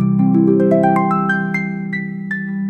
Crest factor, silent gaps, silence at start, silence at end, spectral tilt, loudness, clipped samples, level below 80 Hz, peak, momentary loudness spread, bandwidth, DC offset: 12 dB; none; 0 s; 0 s; -9.5 dB/octave; -16 LUFS; under 0.1%; -56 dBFS; -2 dBFS; 10 LU; 8.2 kHz; under 0.1%